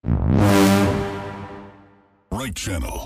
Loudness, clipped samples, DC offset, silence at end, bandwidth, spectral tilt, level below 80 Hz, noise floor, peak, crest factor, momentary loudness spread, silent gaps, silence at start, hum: -19 LUFS; under 0.1%; under 0.1%; 0 s; 16 kHz; -6 dB/octave; -32 dBFS; -54 dBFS; -6 dBFS; 16 dB; 20 LU; none; 0.05 s; none